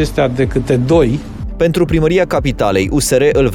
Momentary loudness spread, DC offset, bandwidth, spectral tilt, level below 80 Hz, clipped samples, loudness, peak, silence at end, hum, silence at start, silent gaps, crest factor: 5 LU; under 0.1%; 18.5 kHz; -6 dB/octave; -26 dBFS; under 0.1%; -14 LUFS; 0 dBFS; 0 s; none; 0 s; none; 12 dB